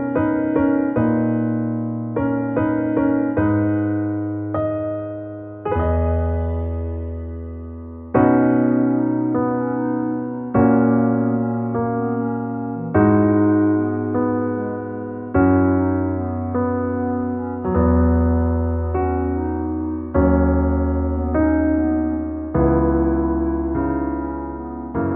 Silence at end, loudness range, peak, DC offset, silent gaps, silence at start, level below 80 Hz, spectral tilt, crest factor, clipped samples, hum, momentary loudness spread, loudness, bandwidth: 0 s; 3 LU; -4 dBFS; under 0.1%; none; 0 s; -30 dBFS; -10.5 dB/octave; 16 dB; under 0.1%; none; 10 LU; -20 LUFS; 3.2 kHz